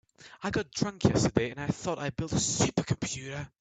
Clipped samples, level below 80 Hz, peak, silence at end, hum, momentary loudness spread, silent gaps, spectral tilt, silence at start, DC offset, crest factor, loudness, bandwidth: under 0.1%; -52 dBFS; -8 dBFS; 0.15 s; none; 8 LU; none; -4.5 dB/octave; 0.2 s; under 0.1%; 22 dB; -30 LUFS; 9.4 kHz